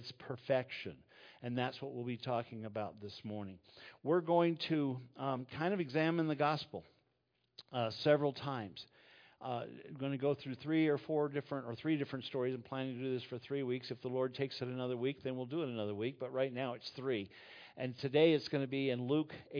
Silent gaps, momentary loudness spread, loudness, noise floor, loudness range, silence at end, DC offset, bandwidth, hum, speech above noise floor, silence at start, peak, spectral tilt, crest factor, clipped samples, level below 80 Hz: none; 14 LU; -38 LUFS; -81 dBFS; 4 LU; 0 s; under 0.1%; 5.4 kHz; none; 43 dB; 0 s; -16 dBFS; -5 dB/octave; 20 dB; under 0.1%; -80 dBFS